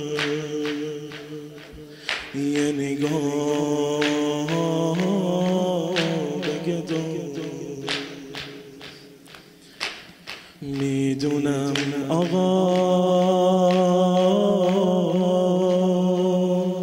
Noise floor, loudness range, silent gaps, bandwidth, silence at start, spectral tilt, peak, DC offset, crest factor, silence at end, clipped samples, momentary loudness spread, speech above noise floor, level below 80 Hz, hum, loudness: -47 dBFS; 12 LU; none; 16 kHz; 0 s; -6 dB/octave; -4 dBFS; under 0.1%; 18 dB; 0 s; under 0.1%; 17 LU; 22 dB; -62 dBFS; none; -22 LUFS